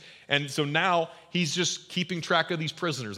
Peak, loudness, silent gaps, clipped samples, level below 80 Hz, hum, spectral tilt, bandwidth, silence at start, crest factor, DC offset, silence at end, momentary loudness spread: -8 dBFS; -27 LUFS; none; under 0.1%; -76 dBFS; none; -3.5 dB/octave; 15.5 kHz; 0 s; 20 dB; under 0.1%; 0 s; 6 LU